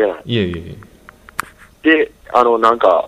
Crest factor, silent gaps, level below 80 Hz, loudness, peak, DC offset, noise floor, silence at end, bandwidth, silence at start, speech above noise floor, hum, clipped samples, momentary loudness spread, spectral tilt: 16 dB; none; -46 dBFS; -15 LUFS; 0 dBFS; under 0.1%; -43 dBFS; 0 s; 14.5 kHz; 0 s; 29 dB; none; under 0.1%; 16 LU; -6 dB/octave